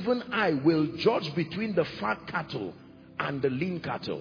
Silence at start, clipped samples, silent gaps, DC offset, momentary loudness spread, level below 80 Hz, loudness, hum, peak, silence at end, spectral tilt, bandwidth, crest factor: 0 s; under 0.1%; none; under 0.1%; 10 LU; -62 dBFS; -29 LUFS; none; -12 dBFS; 0 s; -7.5 dB/octave; 5.4 kHz; 18 dB